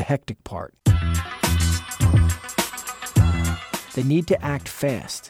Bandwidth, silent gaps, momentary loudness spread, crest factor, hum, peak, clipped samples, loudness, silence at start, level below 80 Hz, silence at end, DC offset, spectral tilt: 16 kHz; none; 10 LU; 16 dB; none; -6 dBFS; under 0.1%; -22 LUFS; 0 s; -30 dBFS; 0 s; under 0.1%; -5.5 dB/octave